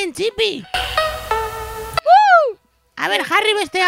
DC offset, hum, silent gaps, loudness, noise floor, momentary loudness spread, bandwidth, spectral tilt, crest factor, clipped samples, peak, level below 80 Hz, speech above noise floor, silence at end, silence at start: under 0.1%; none; none; -16 LUFS; -37 dBFS; 12 LU; 16.5 kHz; -2.5 dB/octave; 16 dB; under 0.1%; 0 dBFS; -40 dBFS; 18 dB; 0 s; 0 s